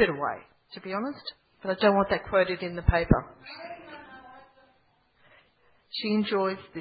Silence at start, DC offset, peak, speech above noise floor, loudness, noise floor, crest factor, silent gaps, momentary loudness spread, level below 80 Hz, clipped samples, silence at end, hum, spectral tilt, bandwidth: 0 s; under 0.1%; -6 dBFS; 39 dB; -27 LUFS; -66 dBFS; 24 dB; none; 20 LU; -42 dBFS; under 0.1%; 0 s; none; -10.5 dB/octave; 5 kHz